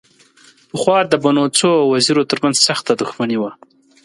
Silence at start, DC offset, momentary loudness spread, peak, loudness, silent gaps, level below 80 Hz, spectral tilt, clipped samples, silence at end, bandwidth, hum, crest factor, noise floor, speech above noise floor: 0.75 s; under 0.1%; 7 LU; 0 dBFS; -15 LUFS; none; -62 dBFS; -3.5 dB/octave; under 0.1%; 0.5 s; 11.5 kHz; none; 16 dB; -49 dBFS; 34 dB